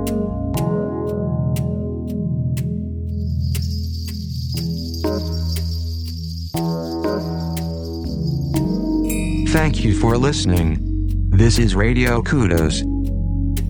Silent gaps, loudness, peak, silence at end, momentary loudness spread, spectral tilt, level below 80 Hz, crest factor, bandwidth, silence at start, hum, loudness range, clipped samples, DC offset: none; -21 LUFS; 0 dBFS; 0 s; 9 LU; -6 dB/octave; -26 dBFS; 18 dB; 19.5 kHz; 0 s; none; 7 LU; under 0.1%; under 0.1%